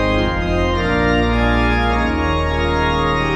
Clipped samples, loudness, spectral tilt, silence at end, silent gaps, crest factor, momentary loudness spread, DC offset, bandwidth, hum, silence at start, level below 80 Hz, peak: under 0.1%; -17 LUFS; -6.5 dB/octave; 0 s; none; 12 dB; 2 LU; under 0.1%; 10.5 kHz; none; 0 s; -22 dBFS; -4 dBFS